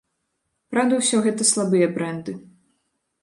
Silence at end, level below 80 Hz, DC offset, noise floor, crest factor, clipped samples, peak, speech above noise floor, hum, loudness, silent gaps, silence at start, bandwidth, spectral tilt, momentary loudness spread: 0.85 s; -70 dBFS; under 0.1%; -75 dBFS; 18 dB; under 0.1%; -6 dBFS; 55 dB; none; -20 LUFS; none; 0.7 s; 11.5 kHz; -3.5 dB/octave; 14 LU